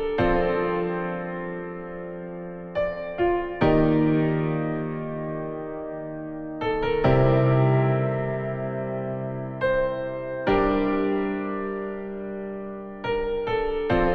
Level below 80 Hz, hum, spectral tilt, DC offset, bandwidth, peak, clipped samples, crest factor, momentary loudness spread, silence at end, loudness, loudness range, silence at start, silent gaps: -40 dBFS; none; -10 dB/octave; under 0.1%; 5.2 kHz; -8 dBFS; under 0.1%; 18 dB; 14 LU; 0 s; -25 LUFS; 4 LU; 0 s; none